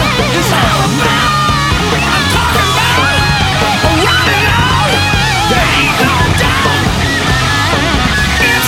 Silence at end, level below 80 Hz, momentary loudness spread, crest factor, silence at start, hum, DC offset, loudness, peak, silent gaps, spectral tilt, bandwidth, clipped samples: 0 s; -22 dBFS; 2 LU; 10 dB; 0 s; none; under 0.1%; -10 LUFS; 0 dBFS; none; -4 dB/octave; 17 kHz; under 0.1%